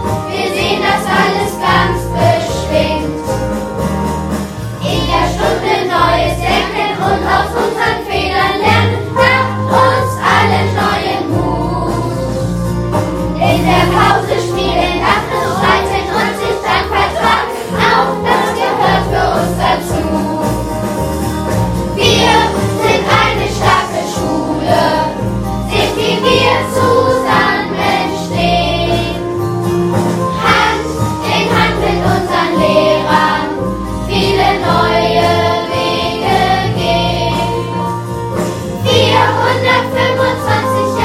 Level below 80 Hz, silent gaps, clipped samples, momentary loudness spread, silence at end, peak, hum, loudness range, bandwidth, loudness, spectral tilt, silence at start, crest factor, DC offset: -28 dBFS; none; under 0.1%; 7 LU; 0 s; 0 dBFS; none; 3 LU; 16 kHz; -13 LUFS; -5 dB/octave; 0 s; 12 dB; under 0.1%